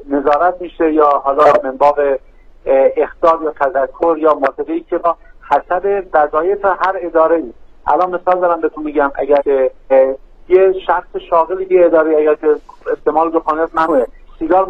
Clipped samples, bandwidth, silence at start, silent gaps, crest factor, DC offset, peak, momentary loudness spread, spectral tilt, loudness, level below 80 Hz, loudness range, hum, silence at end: under 0.1%; 6.6 kHz; 0 s; none; 14 dB; 0.1%; 0 dBFS; 7 LU; -7 dB/octave; -14 LUFS; -42 dBFS; 2 LU; none; 0 s